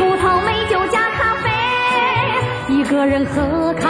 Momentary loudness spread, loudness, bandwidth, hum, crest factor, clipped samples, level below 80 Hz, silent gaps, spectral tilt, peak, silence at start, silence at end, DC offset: 3 LU; -16 LUFS; 10.5 kHz; none; 12 dB; under 0.1%; -38 dBFS; none; -5.5 dB/octave; -4 dBFS; 0 s; 0 s; under 0.1%